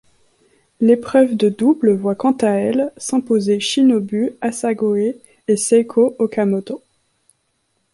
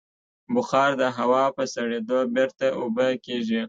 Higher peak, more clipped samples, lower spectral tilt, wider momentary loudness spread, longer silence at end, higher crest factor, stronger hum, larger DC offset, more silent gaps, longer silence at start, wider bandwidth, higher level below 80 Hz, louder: first, -2 dBFS vs -8 dBFS; neither; about the same, -5 dB/octave vs -5 dB/octave; about the same, 7 LU vs 7 LU; first, 1.15 s vs 0 s; about the same, 16 dB vs 16 dB; neither; neither; neither; first, 0.8 s vs 0.5 s; first, 11.5 kHz vs 7.8 kHz; first, -62 dBFS vs -70 dBFS; first, -17 LUFS vs -24 LUFS